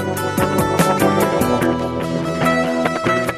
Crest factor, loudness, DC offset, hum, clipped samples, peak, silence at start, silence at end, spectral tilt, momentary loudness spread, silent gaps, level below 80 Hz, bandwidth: 16 dB; -17 LUFS; under 0.1%; none; under 0.1%; -2 dBFS; 0 s; 0 s; -5.5 dB/octave; 6 LU; none; -42 dBFS; 16 kHz